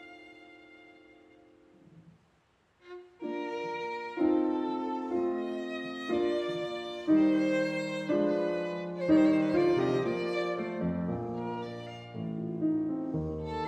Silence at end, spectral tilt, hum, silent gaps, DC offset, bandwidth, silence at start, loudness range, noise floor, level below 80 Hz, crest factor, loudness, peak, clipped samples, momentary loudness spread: 0 s; -7.5 dB/octave; none; none; under 0.1%; 8.4 kHz; 0 s; 9 LU; -69 dBFS; -60 dBFS; 18 dB; -31 LUFS; -14 dBFS; under 0.1%; 13 LU